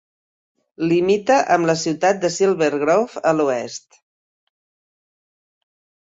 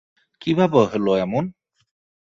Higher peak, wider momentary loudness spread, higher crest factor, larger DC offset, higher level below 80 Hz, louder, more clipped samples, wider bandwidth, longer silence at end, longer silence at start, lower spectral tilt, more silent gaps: about the same, -4 dBFS vs -4 dBFS; second, 9 LU vs 12 LU; about the same, 18 dB vs 18 dB; neither; second, -64 dBFS vs -58 dBFS; about the same, -18 LUFS vs -20 LUFS; neither; about the same, 8 kHz vs 7.4 kHz; first, 2.35 s vs 0.75 s; first, 0.8 s vs 0.4 s; second, -5 dB/octave vs -7.5 dB/octave; neither